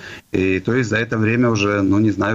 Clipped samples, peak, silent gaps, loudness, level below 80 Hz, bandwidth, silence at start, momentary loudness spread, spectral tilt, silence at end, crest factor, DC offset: under 0.1%; -4 dBFS; none; -18 LUFS; -50 dBFS; 7.8 kHz; 0 s; 3 LU; -6.5 dB/octave; 0 s; 12 dB; under 0.1%